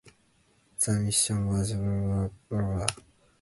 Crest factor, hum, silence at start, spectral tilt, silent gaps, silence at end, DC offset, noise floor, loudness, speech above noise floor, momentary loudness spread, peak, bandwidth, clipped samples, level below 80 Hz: 26 dB; none; 0.05 s; -4.5 dB/octave; none; 0.45 s; under 0.1%; -66 dBFS; -28 LUFS; 38 dB; 8 LU; -2 dBFS; 12 kHz; under 0.1%; -46 dBFS